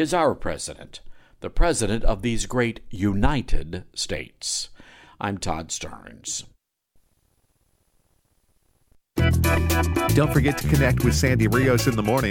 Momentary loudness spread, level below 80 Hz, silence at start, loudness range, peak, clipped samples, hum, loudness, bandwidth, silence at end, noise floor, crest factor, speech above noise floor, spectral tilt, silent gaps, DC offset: 14 LU; -30 dBFS; 0 s; 13 LU; -6 dBFS; under 0.1%; none; -23 LUFS; 17.5 kHz; 0 s; -66 dBFS; 18 dB; 45 dB; -5 dB/octave; none; under 0.1%